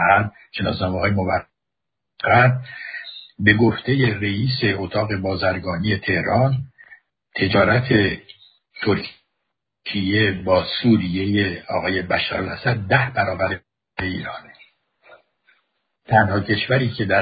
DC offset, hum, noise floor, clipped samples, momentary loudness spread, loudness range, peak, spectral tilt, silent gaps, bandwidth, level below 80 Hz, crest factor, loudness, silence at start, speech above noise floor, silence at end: under 0.1%; none; -83 dBFS; under 0.1%; 13 LU; 4 LU; -2 dBFS; -11.5 dB/octave; none; 5 kHz; -42 dBFS; 20 dB; -20 LUFS; 0 s; 64 dB; 0 s